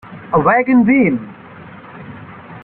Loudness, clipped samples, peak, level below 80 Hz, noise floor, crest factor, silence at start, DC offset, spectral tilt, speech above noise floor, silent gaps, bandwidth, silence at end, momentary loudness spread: -13 LUFS; under 0.1%; -2 dBFS; -50 dBFS; -36 dBFS; 14 dB; 0.1 s; under 0.1%; -11.5 dB/octave; 24 dB; none; 3.9 kHz; 0.05 s; 23 LU